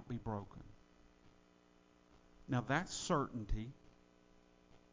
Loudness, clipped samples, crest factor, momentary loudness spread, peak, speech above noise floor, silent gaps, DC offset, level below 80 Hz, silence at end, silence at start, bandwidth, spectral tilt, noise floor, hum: -41 LUFS; under 0.1%; 24 dB; 23 LU; -20 dBFS; 29 dB; none; under 0.1%; -54 dBFS; 0.15 s; 0 s; 7.8 kHz; -5 dB/octave; -69 dBFS; none